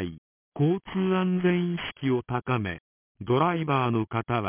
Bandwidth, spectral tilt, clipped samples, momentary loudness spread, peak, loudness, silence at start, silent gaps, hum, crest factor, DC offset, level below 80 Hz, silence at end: 3.6 kHz; -11 dB/octave; under 0.1%; 11 LU; -10 dBFS; -27 LUFS; 0 s; 0.18-0.52 s, 2.80-3.15 s; none; 16 dB; under 0.1%; -56 dBFS; 0 s